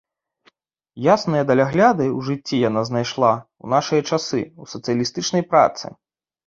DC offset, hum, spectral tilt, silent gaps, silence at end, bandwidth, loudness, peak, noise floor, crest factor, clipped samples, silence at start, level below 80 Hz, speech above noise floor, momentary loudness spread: under 0.1%; none; -5.5 dB/octave; none; 0.6 s; 7.6 kHz; -19 LUFS; -2 dBFS; -60 dBFS; 18 dB; under 0.1%; 0.95 s; -60 dBFS; 41 dB; 10 LU